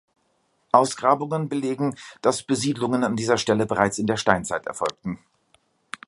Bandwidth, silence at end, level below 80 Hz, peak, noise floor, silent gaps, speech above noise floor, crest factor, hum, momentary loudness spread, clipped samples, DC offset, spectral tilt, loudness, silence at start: 11.5 kHz; 0.9 s; -56 dBFS; 0 dBFS; -68 dBFS; none; 46 dB; 24 dB; none; 8 LU; under 0.1%; under 0.1%; -4.5 dB/octave; -23 LUFS; 0.75 s